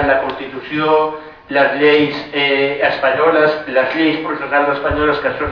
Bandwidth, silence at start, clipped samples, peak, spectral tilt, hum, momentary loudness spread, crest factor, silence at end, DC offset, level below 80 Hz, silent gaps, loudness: 5.4 kHz; 0 s; under 0.1%; -2 dBFS; -7 dB/octave; none; 8 LU; 14 dB; 0 s; under 0.1%; -40 dBFS; none; -15 LUFS